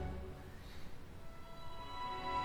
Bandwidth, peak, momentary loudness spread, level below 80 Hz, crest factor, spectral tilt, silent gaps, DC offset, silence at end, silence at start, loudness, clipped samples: 20 kHz; -28 dBFS; 12 LU; -54 dBFS; 16 dB; -5.5 dB/octave; none; under 0.1%; 0 s; 0 s; -48 LUFS; under 0.1%